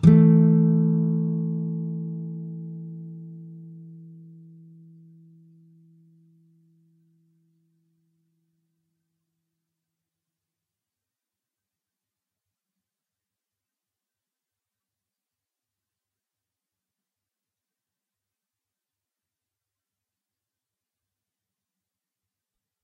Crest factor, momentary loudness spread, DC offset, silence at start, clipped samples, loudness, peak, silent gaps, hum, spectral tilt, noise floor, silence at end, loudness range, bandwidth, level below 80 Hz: 26 dB; 27 LU; under 0.1%; 0 s; under 0.1%; -21 LUFS; -2 dBFS; none; none; -11.5 dB/octave; -89 dBFS; 18.75 s; 26 LU; 3.8 kHz; -60 dBFS